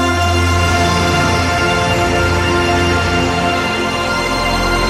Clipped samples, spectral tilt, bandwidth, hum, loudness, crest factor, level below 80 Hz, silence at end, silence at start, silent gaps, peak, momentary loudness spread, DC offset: under 0.1%; -4.5 dB/octave; 15.5 kHz; none; -14 LUFS; 12 dB; -26 dBFS; 0 s; 0 s; none; -2 dBFS; 3 LU; under 0.1%